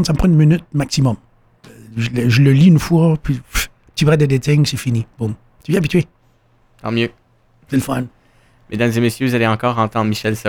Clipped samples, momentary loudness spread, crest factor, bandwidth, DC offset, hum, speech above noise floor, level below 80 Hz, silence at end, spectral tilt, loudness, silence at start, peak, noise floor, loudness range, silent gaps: under 0.1%; 13 LU; 14 dB; 17.5 kHz; under 0.1%; none; 40 dB; -36 dBFS; 0 s; -6.5 dB/octave; -16 LUFS; 0 s; -2 dBFS; -55 dBFS; 7 LU; none